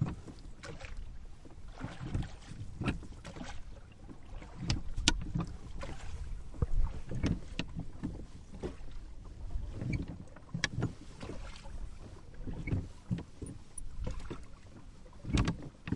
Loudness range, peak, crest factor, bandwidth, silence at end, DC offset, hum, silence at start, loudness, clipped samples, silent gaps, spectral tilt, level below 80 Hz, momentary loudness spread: 6 LU; -4 dBFS; 34 dB; 11 kHz; 0 s; under 0.1%; none; 0 s; -40 LUFS; under 0.1%; none; -4.5 dB/octave; -42 dBFS; 17 LU